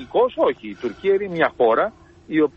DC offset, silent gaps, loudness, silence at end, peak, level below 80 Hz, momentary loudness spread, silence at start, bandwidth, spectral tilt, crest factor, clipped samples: under 0.1%; none; -21 LUFS; 0.1 s; -4 dBFS; -56 dBFS; 8 LU; 0 s; 6.8 kHz; -7.5 dB/octave; 16 dB; under 0.1%